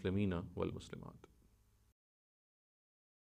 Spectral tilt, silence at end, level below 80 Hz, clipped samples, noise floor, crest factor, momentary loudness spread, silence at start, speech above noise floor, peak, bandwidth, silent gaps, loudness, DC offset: -7.5 dB/octave; 2.05 s; -64 dBFS; under 0.1%; -71 dBFS; 20 dB; 15 LU; 0 s; 30 dB; -26 dBFS; 9.8 kHz; none; -42 LUFS; under 0.1%